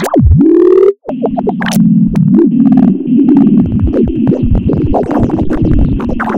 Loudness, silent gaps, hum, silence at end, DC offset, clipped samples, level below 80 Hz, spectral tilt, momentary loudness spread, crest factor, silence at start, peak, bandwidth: -9 LUFS; none; none; 0 s; under 0.1%; 1%; -20 dBFS; -8.5 dB/octave; 7 LU; 8 dB; 0 s; 0 dBFS; 17 kHz